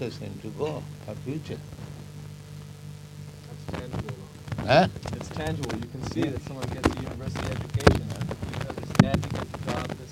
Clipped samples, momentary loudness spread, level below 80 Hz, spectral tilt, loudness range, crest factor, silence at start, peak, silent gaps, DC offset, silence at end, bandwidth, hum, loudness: under 0.1%; 20 LU; -42 dBFS; -6 dB/octave; 11 LU; 28 dB; 0 s; 0 dBFS; none; under 0.1%; 0 s; 16 kHz; 50 Hz at -55 dBFS; -28 LUFS